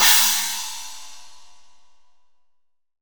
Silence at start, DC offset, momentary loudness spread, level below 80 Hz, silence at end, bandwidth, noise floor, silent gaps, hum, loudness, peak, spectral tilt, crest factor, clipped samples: 0 s; 1%; 26 LU; -64 dBFS; 0 s; over 20 kHz; -65 dBFS; none; none; -17 LUFS; -2 dBFS; 3 dB/octave; 22 dB; under 0.1%